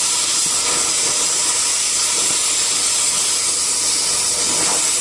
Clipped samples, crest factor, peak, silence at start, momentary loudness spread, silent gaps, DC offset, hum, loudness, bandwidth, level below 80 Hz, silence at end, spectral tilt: under 0.1%; 14 dB; -4 dBFS; 0 s; 1 LU; none; under 0.1%; none; -14 LUFS; 12 kHz; -54 dBFS; 0 s; 1.5 dB/octave